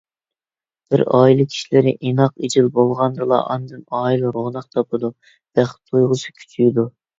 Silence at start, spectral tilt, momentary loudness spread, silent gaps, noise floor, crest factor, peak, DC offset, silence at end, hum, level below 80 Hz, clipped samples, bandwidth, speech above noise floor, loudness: 0.9 s; -7 dB/octave; 10 LU; none; under -90 dBFS; 18 dB; 0 dBFS; under 0.1%; 0.3 s; none; -58 dBFS; under 0.1%; 7.8 kHz; over 73 dB; -18 LUFS